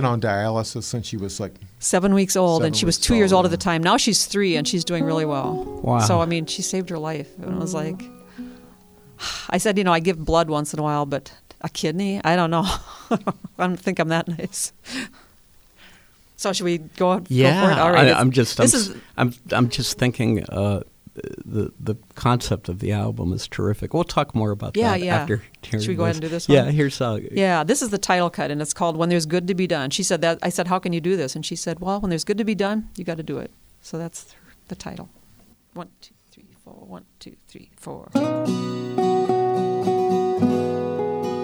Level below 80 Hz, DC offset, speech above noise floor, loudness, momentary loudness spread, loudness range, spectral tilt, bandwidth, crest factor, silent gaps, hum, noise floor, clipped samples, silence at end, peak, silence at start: -46 dBFS; under 0.1%; 32 dB; -21 LUFS; 15 LU; 10 LU; -4.5 dB/octave; over 20 kHz; 22 dB; none; none; -54 dBFS; under 0.1%; 0 s; 0 dBFS; 0 s